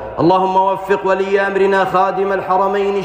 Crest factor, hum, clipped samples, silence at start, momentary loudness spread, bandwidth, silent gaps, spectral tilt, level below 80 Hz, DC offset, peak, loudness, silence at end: 12 dB; none; under 0.1%; 0 s; 3 LU; 15.5 kHz; none; -6.5 dB/octave; -48 dBFS; under 0.1%; -4 dBFS; -15 LUFS; 0 s